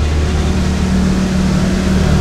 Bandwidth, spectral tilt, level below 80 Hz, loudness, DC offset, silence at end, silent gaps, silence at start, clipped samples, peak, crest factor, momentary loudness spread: 12.5 kHz; -6.5 dB/octave; -20 dBFS; -14 LUFS; under 0.1%; 0 s; none; 0 s; under 0.1%; -2 dBFS; 12 dB; 2 LU